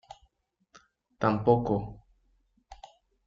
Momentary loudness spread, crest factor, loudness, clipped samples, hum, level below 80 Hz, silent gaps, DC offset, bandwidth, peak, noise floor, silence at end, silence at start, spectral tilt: 9 LU; 24 dB; -27 LUFS; under 0.1%; none; -56 dBFS; none; under 0.1%; 7.4 kHz; -8 dBFS; -72 dBFS; 0.5 s; 1.2 s; -7.5 dB/octave